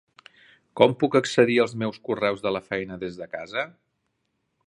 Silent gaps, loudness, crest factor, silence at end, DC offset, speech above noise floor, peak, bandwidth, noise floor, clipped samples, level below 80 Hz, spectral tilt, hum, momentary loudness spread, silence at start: none; -24 LUFS; 24 dB; 1 s; under 0.1%; 52 dB; -2 dBFS; 11 kHz; -76 dBFS; under 0.1%; -64 dBFS; -5.5 dB/octave; none; 14 LU; 0.75 s